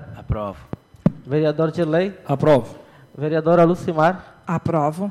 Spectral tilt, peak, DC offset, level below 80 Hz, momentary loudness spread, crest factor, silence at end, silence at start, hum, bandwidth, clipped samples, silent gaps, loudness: -8.5 dB/octave; -6 dBFS; under 0.1%; -44 dBFS; 13 LU; 14 dB; 0 s; 0 s; none; 12 kHz; under 0.1%; none; -20 LUFS